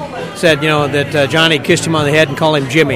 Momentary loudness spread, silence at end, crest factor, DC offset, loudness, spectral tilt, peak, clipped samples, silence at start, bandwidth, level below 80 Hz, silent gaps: 4 LU; 0 s; 12 dB; 0.2%; -12 LUFS; -4.5 dB/octave; 0 dBFS; 0.3%; 0 s; 16.5 kHz; -44 dBFS; none